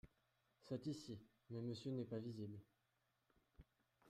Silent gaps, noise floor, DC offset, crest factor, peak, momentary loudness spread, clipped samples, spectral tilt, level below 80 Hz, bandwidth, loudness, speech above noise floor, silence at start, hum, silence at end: none; -86 dBFS; under 0.1%; 16 dB; -36 dBFS; 9 LU; under 0.1%; -7 dB/octave; -78 dBFS; 14.5 kHz; -51 LUFS; 37 dB; 0.05 s; none; 0 s